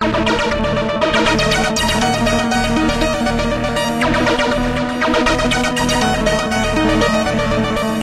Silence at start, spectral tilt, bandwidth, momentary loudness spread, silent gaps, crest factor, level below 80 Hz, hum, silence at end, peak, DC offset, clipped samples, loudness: 0 s; -4.5 dB/octave; 15.5 kHz; 3 LU; none; 14 dB; -28 dBFS; none; 0 s; -2 dBFS; under 0.1%; under 0.1%; -16 LUFS